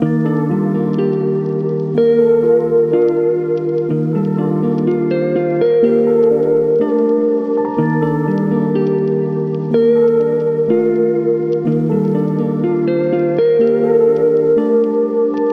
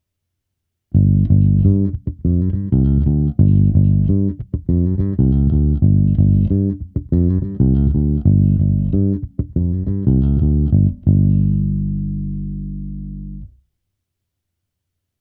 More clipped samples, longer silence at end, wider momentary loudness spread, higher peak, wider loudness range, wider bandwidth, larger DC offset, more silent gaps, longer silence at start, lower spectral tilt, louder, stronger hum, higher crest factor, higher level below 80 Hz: neither; second, 0 s vs 1.75 s; second, 5 LU vs 11 LU; about the same, -2 dBFS vs 0 dBFS; second, 1 LU vs 5 LU; first, 4.9 kHz vs 1.4 kHz; neither; neither; second, 0 s vs 0.95 s; second, -10.5 dB/octave vs -15 dB/octave; about the same, -15 LUFS vs -16 LUFS; neither; about the same, 12 dB vs 16 dB; second, -60 dBFS vs -24 dBFS